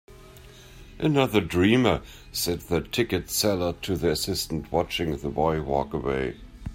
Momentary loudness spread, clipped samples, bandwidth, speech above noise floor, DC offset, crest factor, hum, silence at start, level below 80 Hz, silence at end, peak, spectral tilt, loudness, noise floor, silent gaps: 7 LU; under 0.1%; 16 kHz; 22 dB; under 0.1%; 18 dB; none; 0.1 s; -44 dBFS; 0 s; -8 dBFS; -5 dB/octave; -25 LUFS; -47 dBFS; none